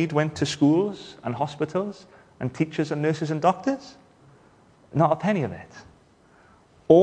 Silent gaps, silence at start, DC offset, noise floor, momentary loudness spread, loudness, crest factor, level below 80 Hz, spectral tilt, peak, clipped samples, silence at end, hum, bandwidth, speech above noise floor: none; 0 s; under 0.1%; -56 dBFS; 14 LU; -25 LUFS; 22 dB; -62 dBFS; -7 dB/octave; -2 dBFS; under 0.1%; 0 s; none; 10.5 kHz; 32 dB